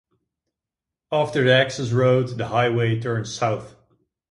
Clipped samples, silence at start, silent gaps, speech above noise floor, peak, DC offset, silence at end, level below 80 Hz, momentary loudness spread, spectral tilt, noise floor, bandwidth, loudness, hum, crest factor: under 0.1%; 1.1 s; none; 66 dB; -4 dBFS; under 0.1%; 0.65 s; -56 dBFS; 8 LU; -5.5 dB/octave; -87 dBFS; 11 kHz; -21 LUFS; none; 18 dB